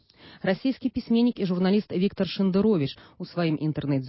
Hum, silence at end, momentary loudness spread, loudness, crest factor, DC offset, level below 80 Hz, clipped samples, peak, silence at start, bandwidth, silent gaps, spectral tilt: none; 0 s; 8 LU; -26 LUFS; 14 dB; under 0.1%; -56 dBFS; under 0.1%; -10 dBFS; 0.25 s; 5.8 kHz; none; -11.5 dB/octave